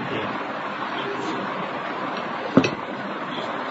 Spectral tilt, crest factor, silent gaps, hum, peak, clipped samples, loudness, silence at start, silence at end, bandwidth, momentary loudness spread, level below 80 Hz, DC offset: -5.5 dB/octave; 24 dB; none; none; -2 dBFS; under 0.1%; -26 LUFS; 0 s; 0 s; 8 kHz; 8 LU; -64 dBFS; under 0.1%